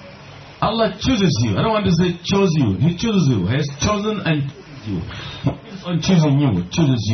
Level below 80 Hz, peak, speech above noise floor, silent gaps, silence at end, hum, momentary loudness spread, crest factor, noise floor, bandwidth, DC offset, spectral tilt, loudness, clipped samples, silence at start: -42 dBFS; -4 dBFS; 21 dB; none; 0 s; none; 12 LU; 14 dB; -39 dBFS; 6.4 kHz; under 0.1%; -6 dB/octave; -19 LUFS; under 0.1%; 0 s